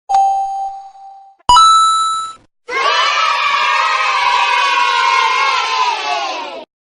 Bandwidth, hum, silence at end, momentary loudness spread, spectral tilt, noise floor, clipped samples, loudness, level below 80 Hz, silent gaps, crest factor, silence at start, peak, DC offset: 11.5 kHz; none; 0.35 s; 15 LU; 1 dB/octave; -38 dBFS; under 0.1%; -12 LUFS; -44 dBFS; none; 14 dB; 0.1 s; 0 dBFS; under 0.1%